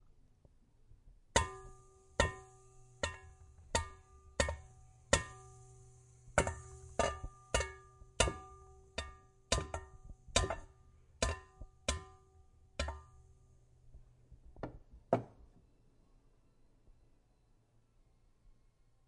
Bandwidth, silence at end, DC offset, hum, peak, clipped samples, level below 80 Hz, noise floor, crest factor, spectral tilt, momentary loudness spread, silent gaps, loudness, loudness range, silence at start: 11.5 kHz; 3.8 s; under 0.1%; none; -10 dBFS; under 0.1%; -50 dBFS; -70 dBFS; 32 dB; -3 dB/octave; 22 LU; none; -39 LUFS; 8 LU; 0.9 s